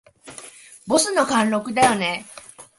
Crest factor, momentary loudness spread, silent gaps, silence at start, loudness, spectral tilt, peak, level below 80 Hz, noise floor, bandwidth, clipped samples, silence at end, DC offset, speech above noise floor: 20 dB; 22 LU; none; 0.25 s; -20 LUFS; -3 dB/octave; -2 dBFS; -60 dBFS; -43 dBFS; 12 kHz; under 0.1%; 0.15 s; under 0.1%; 23 dB